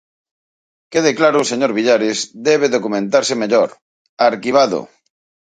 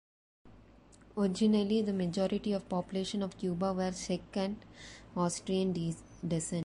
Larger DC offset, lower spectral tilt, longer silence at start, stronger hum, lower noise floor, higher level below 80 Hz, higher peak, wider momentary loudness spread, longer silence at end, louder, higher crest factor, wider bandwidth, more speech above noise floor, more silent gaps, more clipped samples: neither; second, -3.5 dB/octave vs -6 dB/octave; first, 0.9 s vs 0.45 s; neither; first, under -90 dBFS vs -59 dBFS; second, -66 dBFS vs -60 dBFS; first, 0 dBFS vs -18 dBFS; second, 5 LU vs 11 LU; first, 0.7 s vs 0 s; first, -16 LUFS vs -34 LUFS; about the same, 16 dB vs 16 dB; second, 9.6 kHz vs 11.5 kHz; first, over 75 dB vs 26 dB; first, 3.82-4.17 s vs none; neither